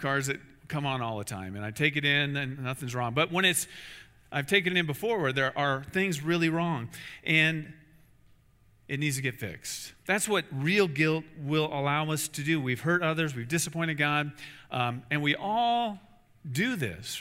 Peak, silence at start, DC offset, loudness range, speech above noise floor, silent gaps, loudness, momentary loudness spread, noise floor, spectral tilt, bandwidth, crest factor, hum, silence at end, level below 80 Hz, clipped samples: -8 dBFS; 0 s; under 0.1%; 3 LU; 32 dB; none; -29 LUFS; 13 LU; -62 dBFS; -4 dB/octave; 16 kHz; 22 dB; none; 0 s; -64 dBFS; under 0.1%